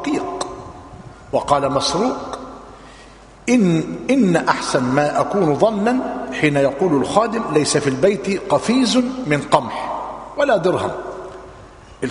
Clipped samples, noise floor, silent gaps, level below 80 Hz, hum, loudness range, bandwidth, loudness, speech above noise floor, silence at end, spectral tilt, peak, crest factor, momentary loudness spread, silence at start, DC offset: under 0.1%; -42 dBFS; none; -48 dBFS; none; 4 LU; 11 kHz; -18 LUFS; 25 dB; 0 s; -5 dB/octave; 0 dBFS; 18 dB; 15 LU; 0 s; under 0.1%